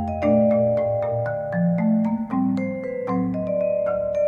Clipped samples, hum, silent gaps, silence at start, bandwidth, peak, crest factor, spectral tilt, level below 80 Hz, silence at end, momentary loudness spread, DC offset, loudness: under 0.1%; none; none; 0 s; 6.8 kHz; -8 dBFS; 14 dB; -10.5 dB/octave; -50 dBFS; 0 s; 6 LU; under 0.1%; -22 LUFS